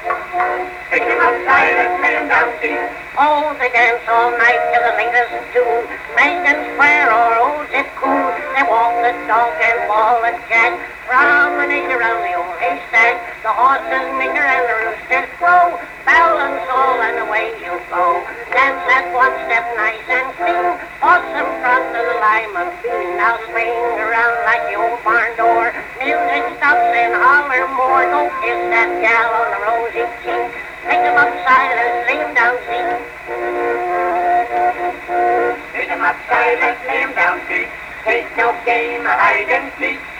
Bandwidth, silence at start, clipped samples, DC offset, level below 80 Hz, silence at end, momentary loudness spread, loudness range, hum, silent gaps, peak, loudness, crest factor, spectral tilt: 15.5 kHz; 0 s; under 0.1%; under 0.1%; -50 dBFS; 0 s; 8 LU; 3 LU; none; none; -2 dBFS; -15 LUFS; 14 dB; -4 dB/octave